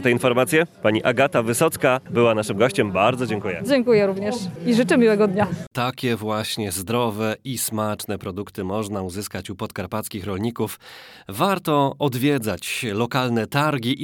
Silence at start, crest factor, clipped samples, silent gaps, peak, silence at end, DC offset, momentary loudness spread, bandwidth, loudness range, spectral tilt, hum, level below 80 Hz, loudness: 0 s; 18 dB; under 0.1%; 5.67-5.71 s; -2 dBFS; 0 s; under 0.1%; 11 LU; 19 kHz; 8 LU; -5 dB/octave; none; -58 dBFS; -22 LUFS